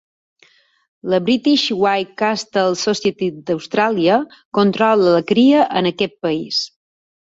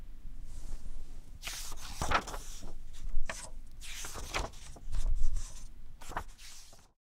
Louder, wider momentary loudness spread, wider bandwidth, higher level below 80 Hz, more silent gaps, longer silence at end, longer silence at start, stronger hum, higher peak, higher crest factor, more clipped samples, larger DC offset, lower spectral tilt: first, -17 LUFS vs -41 LUFS; second, 8 LU vs 18 LU; second, 7.8 kHz vs 14.5 kHz; second, -60 dBFS vs -36 dBFS; first, 4.45-4.52 s vs none; first, 0.55 s vs 0.3 s; first, 1.05 s vs 0 s; neither; first, -2 dBFS vs -14 dBFS; about the same, 16 dB vs 18 dB; neither; neither; first, -5 dB/octave vs -3 dB/octave